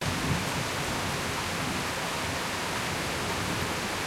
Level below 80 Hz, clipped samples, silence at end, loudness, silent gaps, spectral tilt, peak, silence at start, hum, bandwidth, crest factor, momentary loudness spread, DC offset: -48 dBFS; under 0.1%; 0 s; -30 LUFS; none; -3.5 dB/octave; -14 dBFS; 0 s; none; 16 kHz; 16 dB; 2 LU; under 0.1%